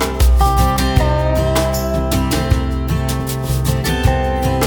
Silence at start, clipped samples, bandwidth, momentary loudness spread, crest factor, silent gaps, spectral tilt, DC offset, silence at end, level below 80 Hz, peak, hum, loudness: 0 s; under 0.1%; over 20 kHz; 5 LU; 14 dB; none; -5.5 dB/octave; under 0.1%; 0 s; -18 dBFS; -2 dBFS; none; -16 LUFS